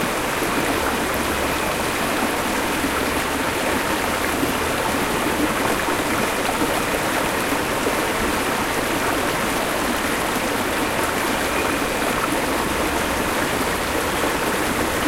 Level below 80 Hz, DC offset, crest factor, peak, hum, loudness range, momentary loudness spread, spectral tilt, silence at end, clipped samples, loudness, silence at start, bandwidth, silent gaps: -38 dBFS; under 0.1%; 16 dB; -6 dBFS; none; 0 LU; 1 LU; -3 dB/octave; 0 s; under 0.1%; -21 LUFS; 0 s; 16 kHz; none